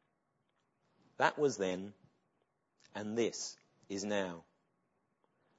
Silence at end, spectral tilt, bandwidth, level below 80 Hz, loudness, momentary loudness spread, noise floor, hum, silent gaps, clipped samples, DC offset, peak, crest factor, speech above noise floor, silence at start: 1.15 s; -3.5 dB/octave; 7.6 kHz; -84 dBFS; -37 LUFS; 15 LU; -81 dBFS; none; none; under 0.1%; under 0.1%; -14 dBFS; 26 dB; 45 dB; 1.2 s